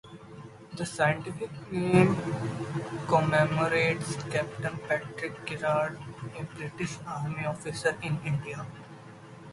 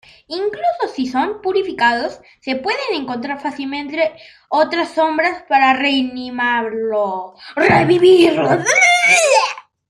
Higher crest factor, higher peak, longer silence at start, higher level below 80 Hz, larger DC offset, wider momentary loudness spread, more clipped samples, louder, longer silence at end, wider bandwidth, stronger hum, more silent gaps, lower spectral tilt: first, 24 dB vs 16 dB; second, -6 dBFS vs 0 dBFS; second, 0.05 s vs 0.3 s; about the same, -60 dBFS vs -56 dBFS; neither; first, 19 LU vs 13 LU; neither; second, -30 LUFS vs -15 LUFS; second, 0 s vs 0.3 s; second, 11.5 kHz vs 15 kHz; neither; neither; first, -6 dB/octave vs -3.5 dB/octave